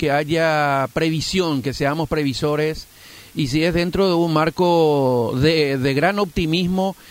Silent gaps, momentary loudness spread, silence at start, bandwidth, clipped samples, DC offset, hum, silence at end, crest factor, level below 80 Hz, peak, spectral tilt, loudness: none; 5 LU; 0 s; 16 kHz; under 0.1%; under 0.1%; none; 0 s; 14 dB; -42 dBFS; -4 dBFS; -6 dB/octave; -19 LUFS